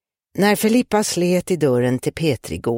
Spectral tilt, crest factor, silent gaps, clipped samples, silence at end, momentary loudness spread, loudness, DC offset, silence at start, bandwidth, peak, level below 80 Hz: -5 dB/octave; 16 dB; none; under 0.1%; 0 s; 5 LU; -19 LUFS; under 0.1%; 0.35 s; 17 kHz; -4 dBFS; -50 dBFS